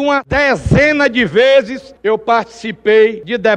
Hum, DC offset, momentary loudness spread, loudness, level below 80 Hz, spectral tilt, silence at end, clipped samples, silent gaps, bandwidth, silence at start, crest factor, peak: none; under 0.1%; 9 LU; -12 LUFS; -34 dBFS; -6 dB/octave; 0 s; under 0.1%; none; 9.8 kHz; 0 s; 12 dB; 0 dBFS